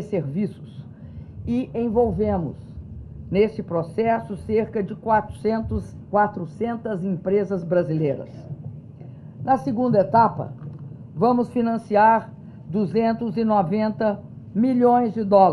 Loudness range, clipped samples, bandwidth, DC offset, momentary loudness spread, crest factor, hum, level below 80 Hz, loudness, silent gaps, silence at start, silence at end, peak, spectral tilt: 4 LU; under 0.1%; 10.5 kHz; under 0.1%; 21 LU; 18 dB; none; -48 dBFS; -22 LUFS; none; 0 s; 0 s; -4 dBFS; -9 dB/octave